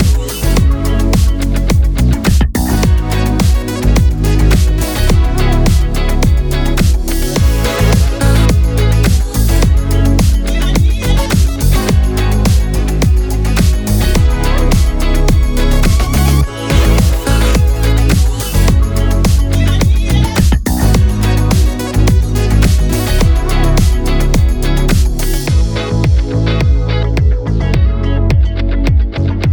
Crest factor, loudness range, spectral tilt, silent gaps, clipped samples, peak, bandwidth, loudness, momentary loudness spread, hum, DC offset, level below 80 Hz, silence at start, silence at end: 10 dB; 1 LU; -6 dB/octave; none; under 0.1%; 0 dBFS; over 20 kHz; -13 LUFS; 3 LU; none; under 0.1%; -12 dBFS; 0 s; 0 s